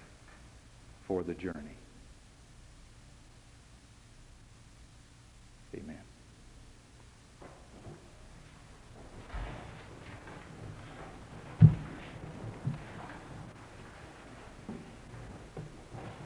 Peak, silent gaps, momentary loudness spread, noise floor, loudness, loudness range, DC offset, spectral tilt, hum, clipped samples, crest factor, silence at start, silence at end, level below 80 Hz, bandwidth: -8 dBFS; none; 18 LU; -57 dBFS; -36 LUFS; 22 LU; under 0.1%; -8 dB/octave; none; under 0.1%; 30 dB; 0 s; 0 s; -54 dBFS; 11 kHz